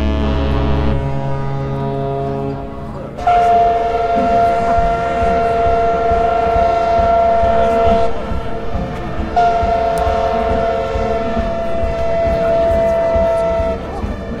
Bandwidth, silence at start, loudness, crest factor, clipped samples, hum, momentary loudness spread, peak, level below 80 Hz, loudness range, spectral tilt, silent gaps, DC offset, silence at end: 10.5 kHz; 0 s; -16 LUFS; 14 dB; under 0.1%; none; 10 LU; 0 dBFS; -26 dBFS; 3 LU; -7.5 dB/octave; none; under 0.1%; 0 s